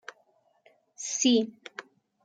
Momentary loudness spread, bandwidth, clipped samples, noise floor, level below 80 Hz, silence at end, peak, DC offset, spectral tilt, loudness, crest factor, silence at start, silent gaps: 22 LU; 9.6 kHz; under 0.1%; -68 dBFS; -82 dBFS; 0.45 s; -12 dBFS; under 0.1%; -2 dB/octave; -27 LUFS; 20 dB; 1 s; none